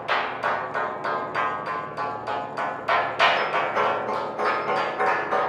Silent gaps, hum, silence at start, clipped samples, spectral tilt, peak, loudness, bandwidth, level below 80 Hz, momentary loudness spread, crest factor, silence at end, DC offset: none; none; 0 s; under 0.1%; -4 dB/octave; -4 dBFS; -25 LUFS; 12.5 kHz; -66 dBFS; 9 LU; 20 dB; 0 s; under 0.1%